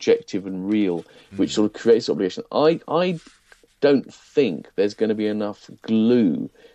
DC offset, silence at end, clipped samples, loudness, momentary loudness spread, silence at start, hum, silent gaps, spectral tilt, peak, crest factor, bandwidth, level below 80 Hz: under 0.1%; 0.25 s; under 0.1%; -22 LUFS; 11 LU; 0 s; none; none; -6 dB/octave; -6 dBFS; 16 dB; 8.6 kHz; -64 dBFS